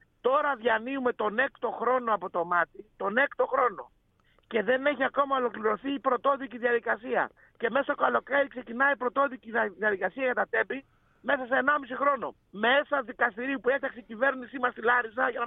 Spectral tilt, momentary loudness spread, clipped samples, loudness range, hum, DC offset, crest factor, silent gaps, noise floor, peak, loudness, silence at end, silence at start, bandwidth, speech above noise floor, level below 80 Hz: -7.5 dB/octave; 6 LU; under 0.1%; 1 LU; none; under 0.1%; 18 dB; none; -66 dBFS; -10 dBFS; -28 LUFS; 0 s; 0.25 s; 4 kHz; 38 dB; -68 dBFS